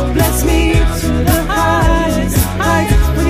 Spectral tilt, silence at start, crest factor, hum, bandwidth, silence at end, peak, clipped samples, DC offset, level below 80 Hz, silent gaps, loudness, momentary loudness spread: -5.5 dB/octave; 0 s; 12 dB; none; 15.5 kHz; 0 s; 0 dBFS; under 0.1%; under 0.1%; -16 dBFS; none; -13 LUFS; 2 LU